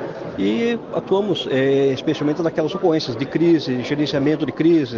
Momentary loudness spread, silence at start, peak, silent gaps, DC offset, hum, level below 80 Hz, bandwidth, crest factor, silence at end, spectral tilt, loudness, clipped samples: 5 LU; 0 s; -6 dBFS; none; under 0.1%; none; -56 dBFS; 7.2 kHz; 12 dB; 0 s; -7 dB/octave; -20 LUFS; under 0.1%